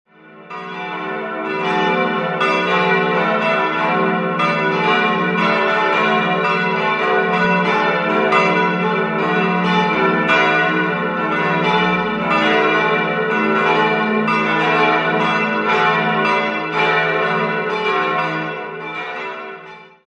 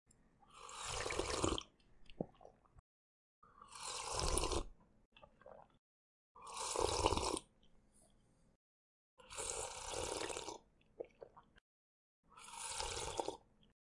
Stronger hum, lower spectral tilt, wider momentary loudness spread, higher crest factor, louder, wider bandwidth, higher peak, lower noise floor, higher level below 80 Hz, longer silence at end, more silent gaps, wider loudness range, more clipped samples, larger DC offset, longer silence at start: neither; first, -6 dB/octave vs -3 dB/octave; second, 10 LU vs 21 LU; second, 16 dB vs 30 dB; first, -16 LUFS vs -42 LUFS; second, 9 kHz vs 11.5 kHz; first, -2 dBFS vs -16 dBFS; second, -38 dBFS vs -72 dBFS; about the same, -58 dBFS vs -56 dBFS; second, 0.25 s vs 0.55 s; second, none vs 2.79-3.42 s, 5.05-5.12 s, 5.79-6.35 s, 8.56-9.17 s, 11.61-12.23 s; second, 2 LU vs 5 LU; neither; neither; second, 0.3 s vs 0.5 s